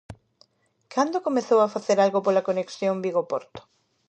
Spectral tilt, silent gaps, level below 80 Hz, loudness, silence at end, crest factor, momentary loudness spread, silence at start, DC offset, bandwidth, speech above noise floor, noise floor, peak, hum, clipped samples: -5.5 dB/octave; none; -64 dBFS; -24 LUFS; 0.5 s; 18 dB; 8 LU; 0.1 s; under 0.1%; 9 kHz; 39 dB; -62 dBFS; -8 dBFS; none; under 0.1%